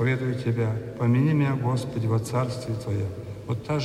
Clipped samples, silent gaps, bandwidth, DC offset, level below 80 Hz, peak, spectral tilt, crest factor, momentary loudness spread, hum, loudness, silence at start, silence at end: under 0.1%; none; 12.5 kHz; under 0.1%; -54 dBFS; -12 dBFS; -7.5 dB/octave; 14 dB; 10 LU; none; -26 LUFS; 0 s; 0 s